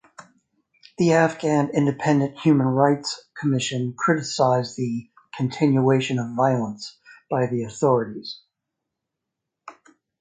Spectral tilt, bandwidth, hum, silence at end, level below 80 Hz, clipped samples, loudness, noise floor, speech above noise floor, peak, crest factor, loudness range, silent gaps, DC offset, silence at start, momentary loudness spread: -6 dB/octave; 9.4 kHz; none; 0.5 s; -64 dBFS; under 0.1%; -22 LUFS; -83 dBFS; 62 dB; -4 dBFS; 18 dB; 6 LU; none; under 0.1%; 0.2 s; 13 LU